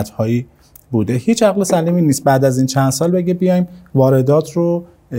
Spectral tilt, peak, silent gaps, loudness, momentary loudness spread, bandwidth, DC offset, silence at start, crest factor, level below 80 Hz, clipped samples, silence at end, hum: -6.5 dB/octave; 0 dBFS; none; -15 LUFS; 6 LU; 16 kHz; under 0.1%; 0 s; 14 dB; -52 dBFS; under 0.1%; 0 s; none